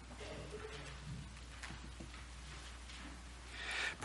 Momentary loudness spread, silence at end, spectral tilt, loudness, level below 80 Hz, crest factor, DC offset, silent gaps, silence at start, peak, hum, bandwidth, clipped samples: 10 LU; 0 s; -3 dB/octave; -48 LUFS; -54 dBFS; 20 dB; under 0.1%; none; 0 s; -28 dBFS; none; 11.5 kHz; under 0.1%